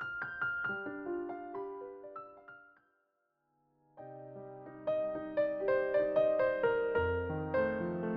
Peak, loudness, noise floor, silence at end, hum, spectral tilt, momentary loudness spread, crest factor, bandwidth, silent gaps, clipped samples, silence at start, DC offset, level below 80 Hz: -18 dBFS; -34 LUFS; -80 dBFS; 0 s; none; -5.5 dB/octave; 19 LU; 18 dB; 5.2 kHz; none; under 0.1%; 0 s; under 0.1%; -62 dBFS